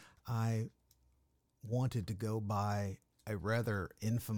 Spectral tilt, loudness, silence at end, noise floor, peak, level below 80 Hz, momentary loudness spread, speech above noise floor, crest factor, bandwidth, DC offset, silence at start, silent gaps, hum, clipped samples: -7 dB/octave; -38 LUFS; 0 s; -76 dBFS; -24 dBFS; -64 dBFS; 8 LU; 39 dB; 14 dB; 18 kHz; under 0.1%; 0 s; none; none; under 0.1%